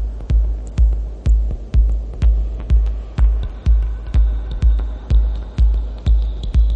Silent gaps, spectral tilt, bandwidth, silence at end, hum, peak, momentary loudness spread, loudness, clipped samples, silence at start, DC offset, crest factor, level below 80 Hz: none; -8 dB/octave; 4.2 kHz; 0 s; none; -4 dBFS; 3 LU; -20 LUFS; under 0.1%; 0 s; under 0.1%; 10 dB; -16 dBFS